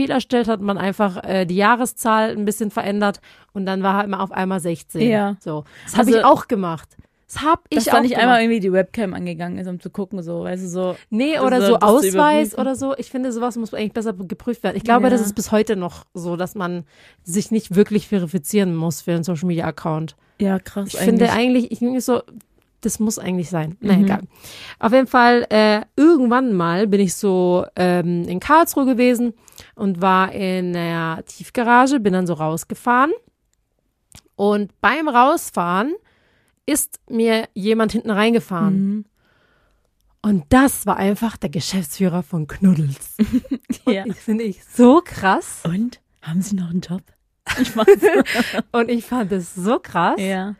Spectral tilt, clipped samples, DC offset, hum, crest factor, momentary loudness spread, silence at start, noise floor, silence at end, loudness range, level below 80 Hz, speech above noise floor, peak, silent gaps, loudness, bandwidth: -5.5 dB/octave; under 0.1%; under 0.1%; none; 18 dB; 12 LU; 0 s; -68 dBFS; 0.05 s; 4 LU; -50 dBFS; 50 dB; 0 dBFS; none; -18 LUFS; 15.5 kHz